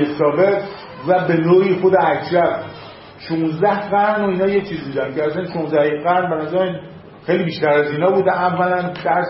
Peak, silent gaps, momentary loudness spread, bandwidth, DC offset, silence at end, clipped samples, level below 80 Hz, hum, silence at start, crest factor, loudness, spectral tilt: -2 dBFS; none; 11 LU; 5.8 kHz; under 0.1%; 0 s; under 0.1%; -56 dBFS; none; 0 s; 14 dB; -17 LUFS; -11 dB/octave